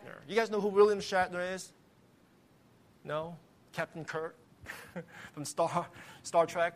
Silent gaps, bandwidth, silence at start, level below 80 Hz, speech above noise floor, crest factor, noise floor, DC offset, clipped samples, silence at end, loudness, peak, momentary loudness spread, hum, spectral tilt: none; 15 kHz; 0 s; -70 dBFS; 32 dB; 22 dB; -64 dBFS; under 0.1%; under 0.1%; 0 s; -33 LUFS; -12 dBFS; 21 LU; none; -4.5 dB/octave